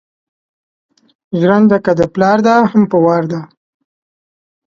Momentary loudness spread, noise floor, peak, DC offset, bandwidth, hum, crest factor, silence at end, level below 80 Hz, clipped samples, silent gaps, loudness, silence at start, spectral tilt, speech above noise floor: 10 LU; under -90 dBFS; 0 dBFS; under 0.1%; 7.2 kHz; none; 14 dB; 1.2 s; -52 dBFS; under 0.1%; none; -12 LUFS; 1.3 s; -8 dB/octave; over 79 dB